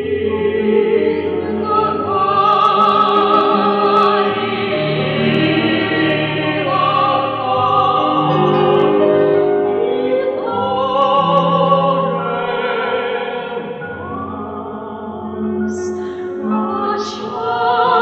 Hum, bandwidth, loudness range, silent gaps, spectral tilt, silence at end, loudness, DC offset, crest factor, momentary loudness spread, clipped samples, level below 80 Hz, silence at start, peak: none; 8 kHz; 9 LU; none; -6.5 dB/octave; 0 s; -15 LUFS; under 0.1%; 16 dB; 11 LU; under 0.1%; -54 dBFS; 0 s; 0 dBFS